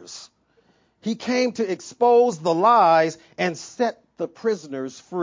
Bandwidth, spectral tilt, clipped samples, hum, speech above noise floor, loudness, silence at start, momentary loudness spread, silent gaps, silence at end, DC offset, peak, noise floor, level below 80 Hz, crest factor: 7.6 kHz; -5 dB/octave; under 0.1%; none; 41 dB; -21 LUFS; 0.1 s; 17 LU; none; 0 s; under 0.1%; -6 dBFS; -62 dBFS; -70 dBFS; 16 dB